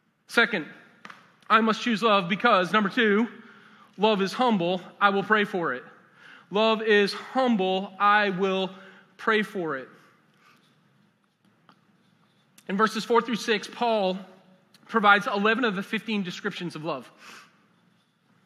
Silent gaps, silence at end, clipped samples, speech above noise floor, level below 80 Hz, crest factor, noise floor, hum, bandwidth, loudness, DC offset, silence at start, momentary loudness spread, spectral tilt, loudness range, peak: none; 1.05 s; under 0.1%; 41 dB; -90 dBFS; 22 dB; -66 dBFS; none; 13.5 kHz; -24 LUFS; under 0.1%; 0.3 s; 12 LU; -5 dB/octave; 8 LU; -4 dBFS